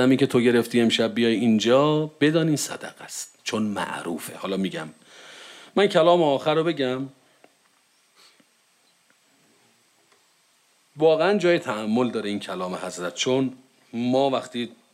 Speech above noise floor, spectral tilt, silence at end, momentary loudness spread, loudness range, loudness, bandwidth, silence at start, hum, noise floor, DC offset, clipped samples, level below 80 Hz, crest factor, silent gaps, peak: 41 dB; -5 dB/octave; 0.2 s; 15 LU; 8 LU; -23 LUFS; 16 kHz; 0 s; none; -63 dBFS; under 0.1%; under 0.1%; -74 dBFS; 18 dB; none; -6 dBFS